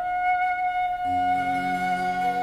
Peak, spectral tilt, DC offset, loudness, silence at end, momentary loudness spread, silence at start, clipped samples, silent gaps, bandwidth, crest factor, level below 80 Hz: -16 dBFS; -5 dB/octave; under 0.1%; -25 LUFS; 0 s; 2 LU; 0 s; under 0.1%; none; 13.5 kHz; 10 dB; -54 dBFS